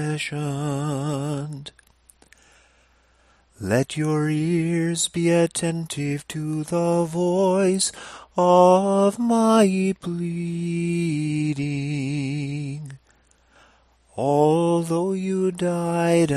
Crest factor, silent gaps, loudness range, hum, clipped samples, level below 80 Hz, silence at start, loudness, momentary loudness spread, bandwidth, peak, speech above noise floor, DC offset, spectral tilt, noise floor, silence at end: 18 dB; none; 9 LU; none; under 0.1%; -58 dBFS; 0 s; -22 LUFS; 11 LU; 13 kHz; -4 dBFS; 38 dB; under 0.1%; -6 dB/octave; -59 dBFS; 0 s